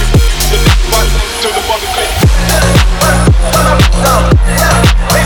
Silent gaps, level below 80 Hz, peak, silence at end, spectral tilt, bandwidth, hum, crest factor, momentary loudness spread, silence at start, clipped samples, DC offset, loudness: none; -12 dBFS; 0 dBFS; 0 s; -4.5 dB/octave; 19.5 kHz; none; 8 dB; 5 LU; 0 s; under 0.1%; under 0.1%; -9 LUFS